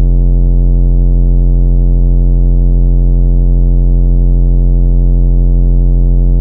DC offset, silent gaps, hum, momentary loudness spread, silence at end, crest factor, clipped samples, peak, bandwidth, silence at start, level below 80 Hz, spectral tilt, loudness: under 0.1%; none; none; 0 LU; 0 s; 6 dB; under 0.1%; 0 dBFS; 1 kHz; 0 s; -8 dBFS; -13.5 dB/octave; -12 LUFS